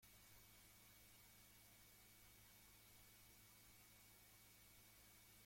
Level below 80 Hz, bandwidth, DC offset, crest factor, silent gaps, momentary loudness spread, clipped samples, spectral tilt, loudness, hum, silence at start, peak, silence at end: -80 dBFS; 16.5 kHz; under 0.1%; 14 dB; none; 0 LU; under 0.1%; -2 dB/octave; -66 LUFS; none; 0 s; -54 dBFS; 0 s